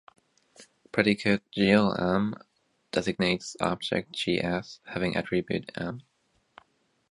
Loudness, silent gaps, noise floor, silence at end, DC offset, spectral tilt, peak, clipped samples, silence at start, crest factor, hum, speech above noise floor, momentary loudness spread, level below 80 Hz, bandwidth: -28 LUFS; none; -68 dBFS; 1.1 s; under 0.1%; -5.5 dB/octave; -6 dBFS; under 0.1%; 0.6 s; 24 dB; none; 41 dB; 12 LU; -58 dBFS; 11 kHz